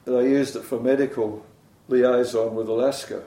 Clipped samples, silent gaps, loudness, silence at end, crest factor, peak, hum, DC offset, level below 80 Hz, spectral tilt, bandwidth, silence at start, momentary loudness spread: under 0.1%; none; -23 LUFS; 0 s; 14 dB; -8 dBFS; none; under 0.1%; -66 dBFS; -5.5 dB/octave; 16 kHz; 0.05 s; 8 LU